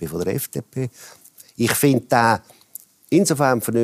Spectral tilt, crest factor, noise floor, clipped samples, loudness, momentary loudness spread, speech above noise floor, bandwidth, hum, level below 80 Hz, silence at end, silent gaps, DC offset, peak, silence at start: -5 dB/octave; 18 dB; -44 dBFS; under 0.1%; -20 LUFS; 23 LU; 24 dB; 15.5 kHz; none; -56 dBFS; 0 s; none; under 0.1%; -4 dBFS; 0 s